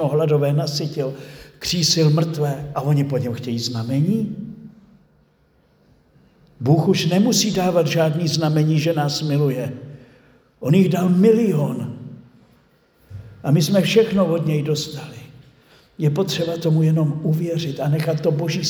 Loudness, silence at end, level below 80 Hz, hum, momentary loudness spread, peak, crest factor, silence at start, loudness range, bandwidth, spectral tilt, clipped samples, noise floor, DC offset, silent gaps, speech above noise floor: -19 LUFS; 0 s; -56 dBFS; none; 13 LU; -2 dBFS; 18 dB; 0 s; 5 LU; 20 kHz; -6 dB/octave; under 0.1%; -59 dBFS; under 0.1%; none; 40 dB